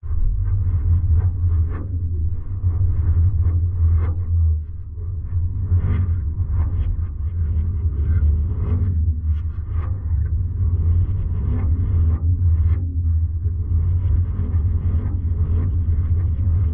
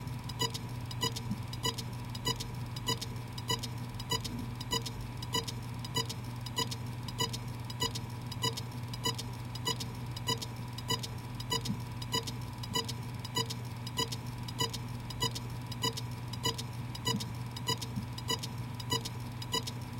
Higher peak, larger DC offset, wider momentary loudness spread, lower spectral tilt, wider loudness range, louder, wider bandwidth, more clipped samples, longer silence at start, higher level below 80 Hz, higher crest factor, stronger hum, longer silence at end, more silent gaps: first, -8 dBFS vs -18 dBFS; neither; about the same, 6 LU vs 6 LU; first, -13 dB/octave vs -3.5 dB/octave; about the same, 2 LU vs 1 LU; first, -21 LUFS vs -36 LUFS; second, 2.2 kHz vs 17 kHz; neither; about the same, 0.05 s vs 0 s; first, -24 dBFS vs -54 dBFS; second, 10 dB vs 20 dB; neither; about the same, 0 s vs 0 s; neither